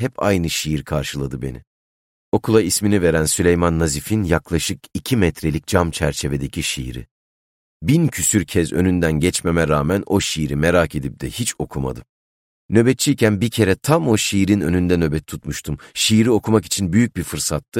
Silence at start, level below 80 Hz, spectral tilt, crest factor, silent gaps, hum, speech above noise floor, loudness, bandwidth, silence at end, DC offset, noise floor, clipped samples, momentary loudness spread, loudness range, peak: 0 s; -36 dBFS; -5 dB/octave; 16 dB; 1.67-2.32 s, 7.11-7.80 s, 12.09-12.69 s, 17.68-17.72 s; none; over 72 dB; -19 LUFS; 16.5 kHz; 0 s; under 0.1%; under -90 dBFS; under 0.1%; 11 LU; 3 LU; -2 dBFS